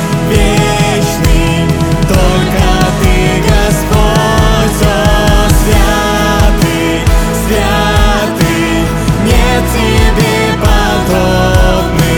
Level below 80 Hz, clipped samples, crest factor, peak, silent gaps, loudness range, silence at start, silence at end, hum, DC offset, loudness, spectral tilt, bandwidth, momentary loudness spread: -14 dBFS; under 0.1%; 8 dB; 0 dBFS; none; 1 LU; 0 s; 0 s; none; under 0.1%; -10 LUFS; -5 dB/octave; 18.5 kHz; 2 LU